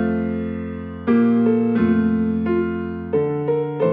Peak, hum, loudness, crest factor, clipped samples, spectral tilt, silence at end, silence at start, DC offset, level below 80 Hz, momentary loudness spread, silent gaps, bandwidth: -6 dBFS; none; -20 LUFS; 14 dB; under 0.1%; -11.5 dB/octave; 0 s; 0 s; under 0.1%; -48 dBFS; 10 LU; none; 3.8 kHz